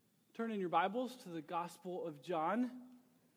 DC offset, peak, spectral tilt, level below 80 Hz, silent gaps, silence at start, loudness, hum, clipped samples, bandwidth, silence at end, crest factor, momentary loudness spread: under 0.1%; -20 dBFS; -6 dB/octave; under -90 dBFS; none; 0.35 s; -40 LUFS; none; under 0.1%; 19.5 kHz; 0.4 s; 20 dB; 11 LU